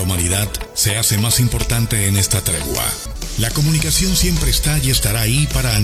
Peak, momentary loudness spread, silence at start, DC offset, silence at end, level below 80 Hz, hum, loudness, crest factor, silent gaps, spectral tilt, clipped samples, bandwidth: 0 dBFS; 5 LU; 0 s; under 0.1%; 0 s; -24 dBFS; none; -16 LUFS; 16 dB; none; -3.5 dB/octave; under 0.1%; 15.5 kHz